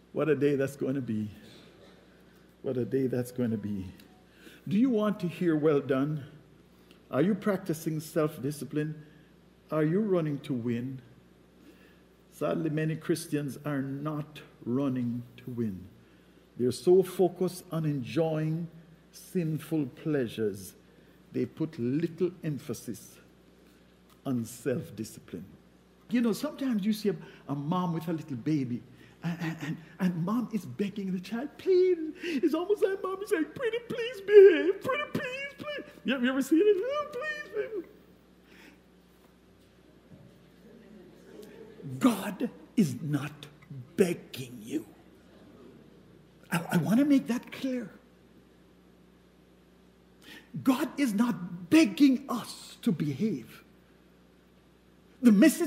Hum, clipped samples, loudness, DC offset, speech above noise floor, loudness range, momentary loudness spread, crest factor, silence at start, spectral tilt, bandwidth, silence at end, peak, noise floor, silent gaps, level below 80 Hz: none; under 0.1%; -30 LUFS; under 0.1%; 31 dB; 10 LU; 16 LU; 24 dB; 0.15 s; -6.5 dB/octave; 16 kHz; 0 s; -6 dBFS; -60 dBFS; none; -68 dBFS